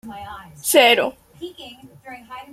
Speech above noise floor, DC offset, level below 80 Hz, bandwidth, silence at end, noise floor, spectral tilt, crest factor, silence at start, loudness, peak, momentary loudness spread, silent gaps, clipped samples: 17 dB; under 0.1%; -58 dBFS; 16.5 kHz; 0.1 s; -36 dBFS; -1.5 dB/octave; 20 dB; 0.05 s; -16 LUFS; -2 dBFS; 26 LU; none; under 0.1%